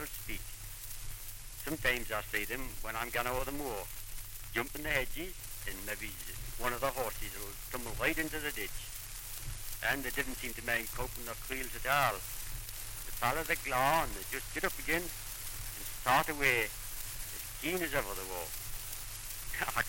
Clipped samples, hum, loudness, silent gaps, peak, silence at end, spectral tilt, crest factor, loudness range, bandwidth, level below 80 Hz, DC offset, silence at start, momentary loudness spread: under 0.1%; none; -36 LUFS; none; -16 dBFS; 0 s; -2.5 dB/octave; 22 dB; 4 LU; 17 kHz; -46 dBFS; under 0.1%; 0 s; 12 LU